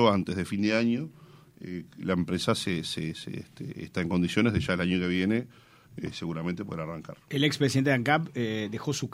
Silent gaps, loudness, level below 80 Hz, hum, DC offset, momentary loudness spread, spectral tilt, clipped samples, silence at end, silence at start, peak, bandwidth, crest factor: none; -28 LUFS; -58 dBFS; none; under 0.1%; 15 LU; -5.5 dB/octave; under 0.1%; 0 s; 0 s; -8 dBFS; 16 kHz; 20 dB